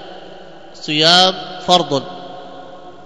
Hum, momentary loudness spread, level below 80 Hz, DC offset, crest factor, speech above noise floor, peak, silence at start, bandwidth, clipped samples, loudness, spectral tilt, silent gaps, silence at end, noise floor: none; 26 LU; -58 dBFS; 1%; 18 dB; 23 dB; 0 dBFS; 0 s; 11 kHz; 0.2%; -13 LUFS; -3 dB/octave; none; 0.15 s; -38 dBFS